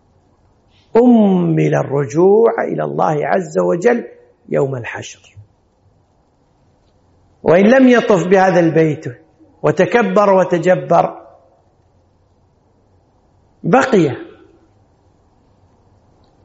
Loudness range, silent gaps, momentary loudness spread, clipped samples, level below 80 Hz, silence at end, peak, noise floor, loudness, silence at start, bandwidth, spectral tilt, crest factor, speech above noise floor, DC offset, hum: 8 LU; none; 12 LU; under 0.1%; -56 dBFS; 2.2 s; 0 dBFS; -56 dBFS; -13 LUFS; 0.95 s; 8 kHz; -6.5 dB/octave; 16 dB; 44 dB; under 0.1%; none